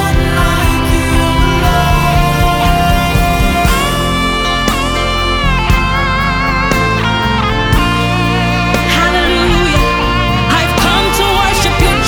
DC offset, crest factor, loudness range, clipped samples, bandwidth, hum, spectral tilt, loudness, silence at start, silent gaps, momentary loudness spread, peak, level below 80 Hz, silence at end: under 0.1%; 10 dB; 2 LU; under 0.1%; over 20 kHz; none; -4.5 dB/octave; -11 LUFS; 0 s; none; 2 LU; 0 dBFS; -18 dBFS; 0 s